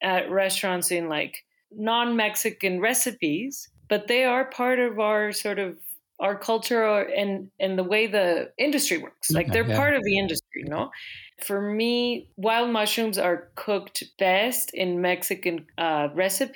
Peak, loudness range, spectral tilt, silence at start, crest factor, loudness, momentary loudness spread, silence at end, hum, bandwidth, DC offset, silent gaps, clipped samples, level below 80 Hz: -10 dBFS; 2 LU; -3.5 dB/octave; 0 s; 16 dB; -25 LUFS; 9 LU; 0 s; none; 19 kHz; under 0.1%; none; under 0.1%; -62 dBFS